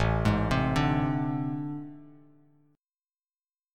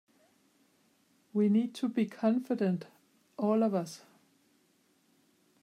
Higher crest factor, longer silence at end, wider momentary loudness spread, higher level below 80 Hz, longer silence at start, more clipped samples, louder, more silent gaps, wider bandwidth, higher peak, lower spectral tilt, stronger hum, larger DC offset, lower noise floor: about the same, 20 dB vs 18 dB; about the same, 1.65 s vs 1.65 s; second, 12 LU vs 17 LU; first, -42 dBFS vs -88 dBFS; second, 0 s vs 1.35 s; neither; first, -28 LUFS vs -31 LUFS; neither; about the same, 12.5 kHz vs 13 kHz; first, -10 dBFS vs -16 dBFS; about the same, -7 dB/octave vs -7.5 dB/octave; neither; neither; first, under -90 dBFS vs -70 dBFS